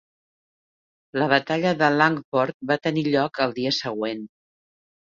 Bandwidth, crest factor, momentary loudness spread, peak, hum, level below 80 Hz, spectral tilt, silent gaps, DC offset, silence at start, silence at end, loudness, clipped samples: 7.4 kHz; 24 dB; 10 LU; -2 dBFS; none; -66 dBFS; -5.5 dB/octave; 2.24-2.32 s, 2.54-2.60 s; under 0.1%; 1.15 s; 0.85 s; -23 LUFS; under 0.1%